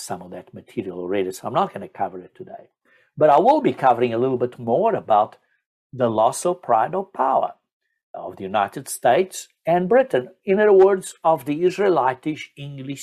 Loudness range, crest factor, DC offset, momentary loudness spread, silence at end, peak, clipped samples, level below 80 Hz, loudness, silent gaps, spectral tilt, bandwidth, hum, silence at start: 4 LU; 18 dB; under 0.1%; 18 LU; 0 s; -4 dBFS; under 0.1%; -66 dBFS; -20 LUFS; 5.66-5.90 s, 7.72-7.80 s, 8.03-8.14 s; -5.5 dB/octave; 14 kHz; none; 0 s